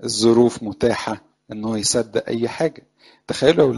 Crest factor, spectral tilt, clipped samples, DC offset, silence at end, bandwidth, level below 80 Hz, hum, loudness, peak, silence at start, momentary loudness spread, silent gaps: 18 dB; -4.5 dB/octave; under 0.1%; under 0.1%; 0 s; 11.5 kHz; -52 dBFS; none; -20 LUFS; 0 dBFS; 0 s; 14 LU; none